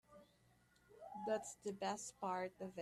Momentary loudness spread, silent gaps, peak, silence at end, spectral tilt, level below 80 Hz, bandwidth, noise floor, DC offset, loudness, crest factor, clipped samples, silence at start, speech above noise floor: 8 LU; none; -30 dBFS; 0 s; -4 dB/octave; -82 dBFS; 14 kHz; -74 dBFS; under 0.1%; -46 LUFS; 18 dB; under 0.1%; 0.1 s; 29 dB